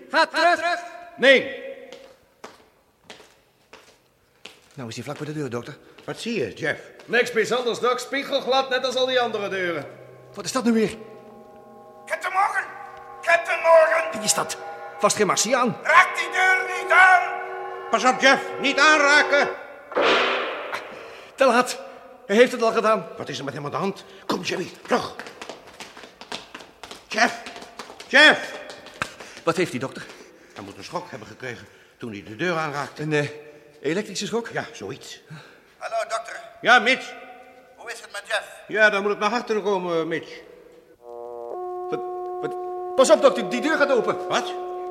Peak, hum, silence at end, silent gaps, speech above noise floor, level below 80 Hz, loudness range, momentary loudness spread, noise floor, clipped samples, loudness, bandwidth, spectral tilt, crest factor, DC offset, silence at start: -2 dBFS; none; 0 s; none; 39 dB; -68 dBFS; 12 LU; 23 LU; -61 dBFS; under 0.1%; -21 LUFS; 15.5 kHz; -3 dB/octave; 22 dB; under 0.1%; 0 s